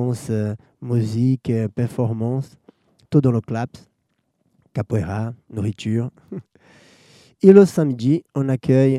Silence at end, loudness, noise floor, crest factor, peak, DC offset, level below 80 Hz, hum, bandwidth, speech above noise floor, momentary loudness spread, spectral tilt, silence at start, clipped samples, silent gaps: 0 s; -20 LUFS; -70 dBFS; 20 dB; 0 dBFS; under 0.1%; -56 dBFS; none; 13 kHz; 52 dB; 17 LU; -8.5 dB/octave; 0 s; under 0.1%; none